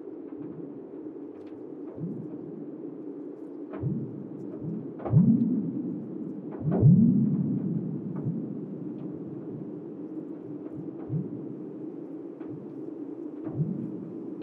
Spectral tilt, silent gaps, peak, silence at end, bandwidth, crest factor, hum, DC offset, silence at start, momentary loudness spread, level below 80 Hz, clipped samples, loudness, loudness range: -13.5 dB/octave; none; -10 dBFS; 0 s; 2.7 kHz; 20 dB; none; under 0.1%; 0 s; 17 LU; -60 dBFS; under 0.1%; -31 LUFS; 13 LU